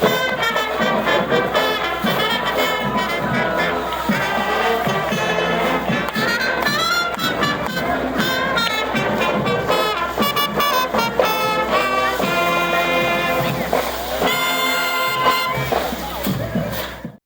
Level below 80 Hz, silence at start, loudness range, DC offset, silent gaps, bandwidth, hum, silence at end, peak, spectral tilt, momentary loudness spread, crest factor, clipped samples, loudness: -42 dBFS; 0 s; 1 LU; under 0.1%; none; over 20 kHz; none; 0.1 s; 0 dBFS; -4 dB/octave; 4 LU; 18 dB; under 0.1%; -18 LUFS